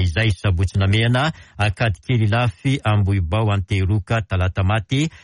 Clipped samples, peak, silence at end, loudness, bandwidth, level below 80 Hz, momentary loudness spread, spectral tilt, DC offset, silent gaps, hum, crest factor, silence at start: under 0.1%; -8 dBFS; 0.1 s; -20 LUFS; 11 kHz; -36 dBFS; 4 LU; -6.5 dB/octave; under 0.1%; none; none; 10 dB; 0 s